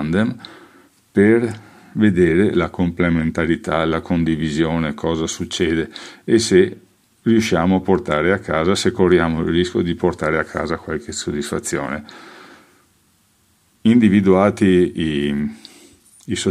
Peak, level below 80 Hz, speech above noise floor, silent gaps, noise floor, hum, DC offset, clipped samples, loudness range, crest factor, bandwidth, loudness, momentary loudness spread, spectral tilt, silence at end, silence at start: 0 dBFS; -46 dBFS; 42 dB; none; -59 dBFS; none; under 0.1%; under 0.1%; 6 LU; 18 dB; 14 kHz; -18 LUFS; 10 LU; -6 dB/octave; 0 s; 0 s